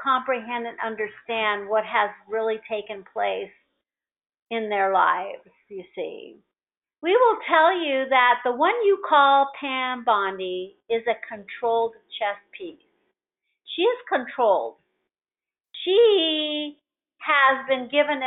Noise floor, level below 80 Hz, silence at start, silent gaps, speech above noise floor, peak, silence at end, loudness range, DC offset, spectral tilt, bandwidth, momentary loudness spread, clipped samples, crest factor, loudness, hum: under -90 dBFS; -74 dBFS; 0 s; 4.42-4.46 s; over 67 dB; -4 dBFS; 0 s; 8 LU; under 0.1%; 0.5 dB/octave; 4.1 kHz; 17 LU; under 0.1%; 20 dB; -22 LUFS; none